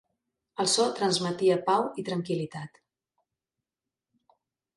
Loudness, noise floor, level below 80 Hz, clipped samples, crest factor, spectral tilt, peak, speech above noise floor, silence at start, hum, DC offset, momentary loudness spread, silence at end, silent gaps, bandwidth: -27 LUFS; -90 dBFS; -74 dBFS; under 0.1%; 18 dB; -4 dB/octave; -12 dBFS; 63 dB; 0.6 s; none; under 0.1%; 16 LU; 2.1 s; none; 11.5 kHz